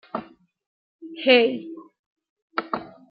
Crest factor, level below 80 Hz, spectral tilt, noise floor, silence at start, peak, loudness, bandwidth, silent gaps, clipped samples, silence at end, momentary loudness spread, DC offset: 22 dB; -74 dBFS; -7.5 dB/octave; -40 dBFS; 0.15 s; -4 dBFS; -22 LUFS; 5.4 kHz; 0.66-0.99 s, 1.99-2.16 s, 2.29-2.48 s; under 0.1%; 0.25 s; 24 LU; under 0.1%